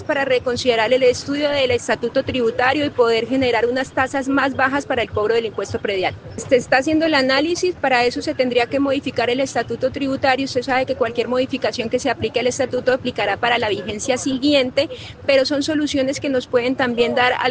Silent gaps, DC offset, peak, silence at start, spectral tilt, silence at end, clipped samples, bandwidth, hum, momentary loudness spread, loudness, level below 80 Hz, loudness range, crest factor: none; under 0.1%; 0 dBFS; 0 s; -4 dB/octave; 0 s; under 0.1%; 9.8 kHz; none; 5 LU; -19 LUFS; -52 dBFS; 2 LU; 18 dB